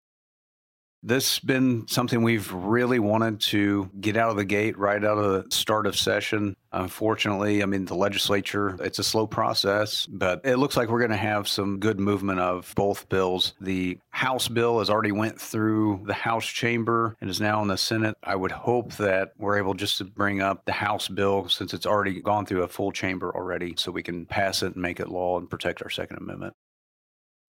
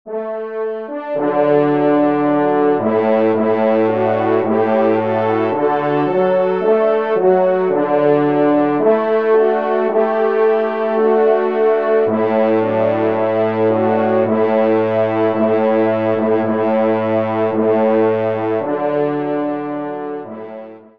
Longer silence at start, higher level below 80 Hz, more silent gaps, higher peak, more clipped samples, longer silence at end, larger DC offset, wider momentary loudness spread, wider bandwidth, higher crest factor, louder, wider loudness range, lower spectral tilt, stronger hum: first, 1.05 s vs 0.05 s; first, -60 dBFS vs -66 dBFS; neither; second, -6 dBFS vs -2 dBFS; neither; first, 1.05 s vs 0.2 s; second, under 0.1% vs 0.4%; about the same, 6 LU vs 7 LU; first, 16.5 kHz vs 5.2 kHz; first, 20 dB vs 12 dB; second, -25 LUFS vs -16 LUFS; about the same, 4 LU vs 2 LU; second, -4.5 dB/octave vs -9.5 dB/octave; neither